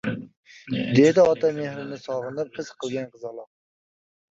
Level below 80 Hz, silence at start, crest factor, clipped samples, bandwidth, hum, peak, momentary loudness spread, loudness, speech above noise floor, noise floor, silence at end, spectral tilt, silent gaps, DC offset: -62 dBFS; 0.05 s; 20 dB; under 0.1%; 7.8 kHz; none; -4 dBFS; 19 LU; -23 LUFS; over 67 dB; under -90 dBFS; 0.9 s; -6.5 dB/octave; 0.37-0.43 s; under 0.1%